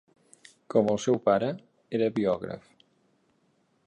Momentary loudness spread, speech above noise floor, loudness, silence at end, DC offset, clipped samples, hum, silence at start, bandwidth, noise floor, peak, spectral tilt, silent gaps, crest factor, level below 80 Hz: 15 LU; 43 dB; -27 LUFS; 1.25 s; under 0.1%; under 0.1%; none; 0.7 s; 11 kHz; -69 dBFS; -10 dBFS; -6.5 dB/octave; none; 20 dB; -66 dBFS